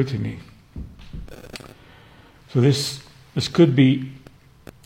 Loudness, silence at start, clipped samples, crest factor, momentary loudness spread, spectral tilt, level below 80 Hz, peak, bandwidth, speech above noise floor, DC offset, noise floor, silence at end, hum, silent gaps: -20 LUFS; 0 s; under 0.1%; 20 dB; 23 LU; -6.5 dB/octave; -46 dBFS; -4 dBFS; 16 kHz; 30 dB; under 0.1%; -49 dBFS; 0.7 s; none; none